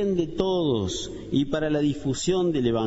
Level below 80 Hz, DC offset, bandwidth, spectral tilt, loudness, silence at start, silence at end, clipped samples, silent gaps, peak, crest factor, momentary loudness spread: -46 dBFS; under 0.1%; 8 kHz; -5.5 dB/octave; -25 LUFS; 0 s; 0 s; under 0.1%; none; -8 dBFS; 16 dB; 4 LU